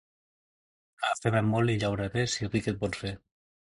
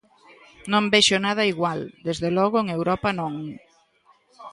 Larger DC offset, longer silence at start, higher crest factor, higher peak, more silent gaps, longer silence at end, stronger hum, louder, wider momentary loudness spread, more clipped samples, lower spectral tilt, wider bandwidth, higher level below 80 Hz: neither; first, 1 s vs 0.65 s; about the same, 20 dB vs 20 dB; second, -10 dBFS vs -4 dBFS; neither; first, 0.65 s vs 0 s; neither; second, -29 LUFS vs -22 LUFS; second, 9 LU vs 14 LU; neither; first, -5.5 dB/octave vs -4 dB/octave; about the same, 11.5 kHz vs 11.5 kHz; about the same, -54 dBFS vs -56 dBFS